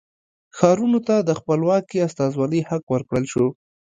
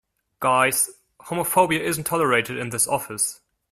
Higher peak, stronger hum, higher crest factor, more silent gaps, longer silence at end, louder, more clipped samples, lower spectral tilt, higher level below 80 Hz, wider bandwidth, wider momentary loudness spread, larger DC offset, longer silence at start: first, 0 dBFS vs -4 dBFS; neither; about the same, 20 dB vs 20 dB; first, 2.83-2.87 s vs none; about the same, 0.45 s vs 0.4 s; about the same, -21 LUFS vs -22 LUFS; neither; first, -7 dB/octave vs -3 dB/octave; about the same, -56 dBFS vs -60 dBFS; second, 9.4 kHz vs 16 kHz; about the same, 6 LU vs 7 LU; neither; first, 0.55 s vs 0.4 s